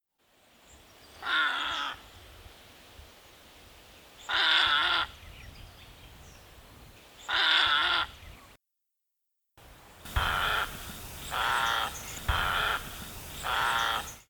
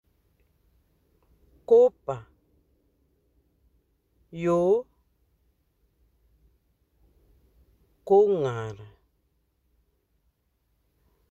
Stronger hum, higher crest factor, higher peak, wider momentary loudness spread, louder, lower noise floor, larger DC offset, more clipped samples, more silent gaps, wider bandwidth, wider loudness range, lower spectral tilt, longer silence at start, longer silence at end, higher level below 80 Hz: neither; about the same, 22 dB vs 22 dB; about the same, -10 dBFS vs -8 dBFS; second, 23 LU vs 26 LU; second, -28 LUFS vs -23 LUFS; first, -83 dBFS vs -73 dBFS; neither; neither; neither; first, over 20 kHz vs 7.8 kHz; about the same, 5 LU vs 3 LU; second, -1.5 dB/octave vs -8 dB/octave; second, 0.75 s vs 1.7 s; second, 0.1 s vs 2.45 s; first, -48 dBFS vs -64 dBFS